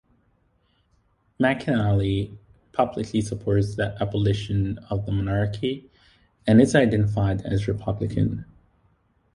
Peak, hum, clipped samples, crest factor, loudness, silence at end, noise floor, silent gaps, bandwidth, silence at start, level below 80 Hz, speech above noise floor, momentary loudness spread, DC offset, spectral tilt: -4 dBFS; none; under 0.1%; 20 dB; -24 LUFS; 0.9 s; -66 dBFS; none; 11 kHz; 1.4 s; -44 dBFS; 43 dB; 10 LU; under 0.1%; -7 dB/octave